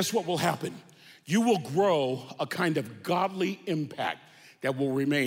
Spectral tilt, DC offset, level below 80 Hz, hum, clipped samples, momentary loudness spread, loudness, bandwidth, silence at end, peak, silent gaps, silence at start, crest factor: -5 dB/octave; under 0.1%; -74 dBFS; none; under 0.1%; 10 LU; -29 LUFS; 16 kHz; 0 s; -12 dBFS; none; 0 s; 16 dB